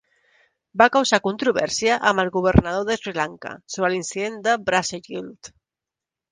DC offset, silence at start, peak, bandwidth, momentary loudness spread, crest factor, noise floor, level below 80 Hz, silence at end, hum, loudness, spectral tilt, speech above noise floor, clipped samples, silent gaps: under 0.1%; 0.75 s; 0 dBFS; 10 kHz; 15 LU; 22 dB; -88 dBFS; -40 dBFS; 0.85 s; none; -21 LUFS; -4 dB/octave; 67 dB; under 0.1%; none